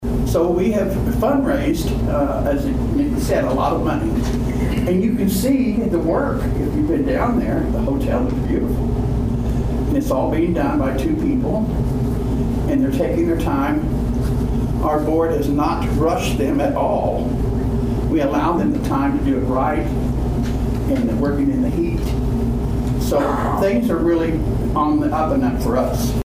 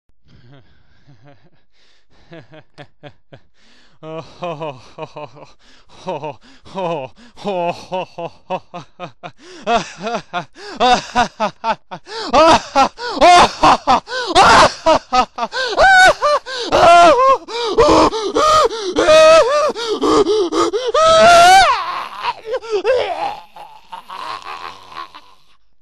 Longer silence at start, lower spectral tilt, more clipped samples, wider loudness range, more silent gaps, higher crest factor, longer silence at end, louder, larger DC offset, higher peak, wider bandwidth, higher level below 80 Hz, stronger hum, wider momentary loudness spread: second, 0 s vs 2.3 s; first, -7.5 dB/octave vs -3 dB/octave; neither; second, 1 LU vs 19 LU; neither; about the same, 12 dB vs 16 dB; second, 0.05 s vs 0.65 s; second, -19 LUFS vs -13 LUFS; second, under 0.1% vs 0.6%; second, -6 dBFS vs 0 dBFS; first, 16 kHz vs 13 kHz; first, -26 dBFS vs -40 dBFS; neither; second, 3 LU vs 24 LU